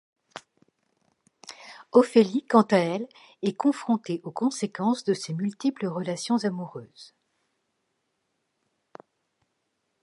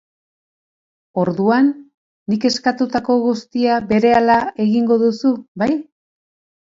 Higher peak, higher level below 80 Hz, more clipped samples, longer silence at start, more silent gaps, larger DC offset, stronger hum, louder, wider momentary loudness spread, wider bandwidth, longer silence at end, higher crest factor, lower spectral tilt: about the same, -4 dBFS vs -2 dBFS; second, -80 dBFS vs -56 dBFS; neither; second, 0.35 s vs 1.15 s; second, none vs 1.94-2.26 s, 5.48-5.55 s; neither; neither; second, -25 LUFS vs -17 LUFS; first, 23 LU vs 8 LU; first, 11.5 kHz vs 7.8 kHz; first, 2.95 s vs 0.95 s; first, 24 dB vs 16 dB; about the same, -6 dB/octave vs -6 dB/octave